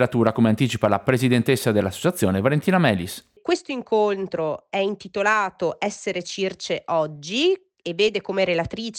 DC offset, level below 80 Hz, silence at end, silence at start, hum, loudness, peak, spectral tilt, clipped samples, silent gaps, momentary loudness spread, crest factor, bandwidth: under 0.1%; -58 dBFS; 0 s; 0 s; none; -22 LUFS; -4 dBFS; -5.5 dB/octave; under 0.1%; none; 8 LU; 18 dB; 18 kHz